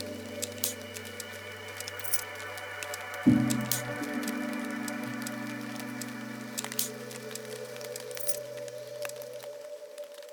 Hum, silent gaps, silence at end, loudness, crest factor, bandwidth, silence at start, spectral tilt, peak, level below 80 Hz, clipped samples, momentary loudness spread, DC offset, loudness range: none; none; 0 s; -34 LUFS; 26 dB; over 20 kHz; 0 s; -3.5 dB/octave; -8 dBFS; -68 dBFS; under 0.1%; 12 LU; under 0.1%; 6 LU